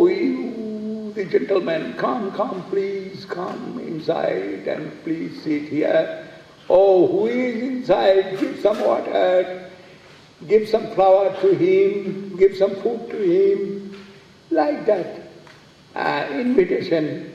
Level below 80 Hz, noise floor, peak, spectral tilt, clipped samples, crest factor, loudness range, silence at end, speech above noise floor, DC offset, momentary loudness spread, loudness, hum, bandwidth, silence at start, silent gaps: -60 dBFS; -47 dBFS; -2 dBFS; -7 dB/octave; under 0.1%; 18 dB; 6 LU; 0 s; 27 dB; under 0.1%; 13 LU; -20 LUFS; none; 7.8 kHz; 0 s; none